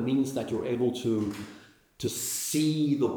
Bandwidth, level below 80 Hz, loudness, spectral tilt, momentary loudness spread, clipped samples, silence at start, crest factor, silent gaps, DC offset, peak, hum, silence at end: over 20 kHz; -64 dBFS; -29 LUFS; -5 dB/octave; 9 LU; under 0.1%; 0 s; 14 dB; none; under 0.1%; -14 dBFS; none; 0 s